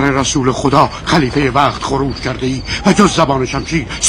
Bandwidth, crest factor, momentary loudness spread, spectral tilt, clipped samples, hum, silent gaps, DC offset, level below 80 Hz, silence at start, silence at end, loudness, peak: 12.5 kHz; 14 dB; 8 LU; -4.5 dB/octave; 0.5%; none; none; under 0.1%; -30 dBFS; 0 s; 0 s; -14 LUFS; 0 dBFS